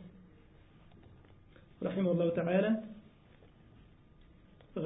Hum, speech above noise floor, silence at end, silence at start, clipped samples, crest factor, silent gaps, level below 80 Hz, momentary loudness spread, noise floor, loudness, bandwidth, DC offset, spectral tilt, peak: none; 29 dB; 0 s; 0 s; under 0.1%; 18 dB; none; -66 dBFS; 22 LU; -60 dBFS; -33 LUFS; 3.8 kHz; under 0.1%; -6 dB/octave; -18 dBFS